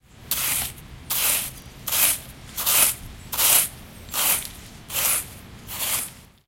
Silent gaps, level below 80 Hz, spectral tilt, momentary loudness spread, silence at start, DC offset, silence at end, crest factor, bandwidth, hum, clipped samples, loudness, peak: none; -48 dBFS; 0 dB/octave; 18 LU; 0.2 s; under 0.1%; 0.25 s; 24 dB; 17 kHz; none; under 0.1%; -21 LUFS; 0 dBFS